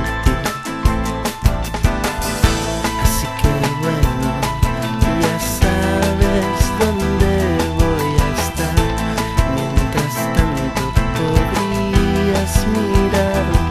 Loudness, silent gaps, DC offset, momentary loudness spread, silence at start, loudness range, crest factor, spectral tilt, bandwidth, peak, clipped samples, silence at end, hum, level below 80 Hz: -17 LUFS; none; under 0.1%; 4 LU; 0 s; 2 LU; 16 dB; -5.5 dB/octave; 16 kHz; 0 dBFS; under 0.1%; 0 s; none; -22 dBFS